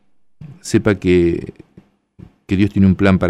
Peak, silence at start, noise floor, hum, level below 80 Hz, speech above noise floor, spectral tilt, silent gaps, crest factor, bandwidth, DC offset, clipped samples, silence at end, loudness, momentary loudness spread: -2 dBFS; 0.4 s; -49 dBFS; none; -40 dBFS; 35 dB; -7 dB/octave; none; 14 dB; 11.5 kHz; under 0.1%; under 0.1%; 0 s; -16 LUFS; 14 LU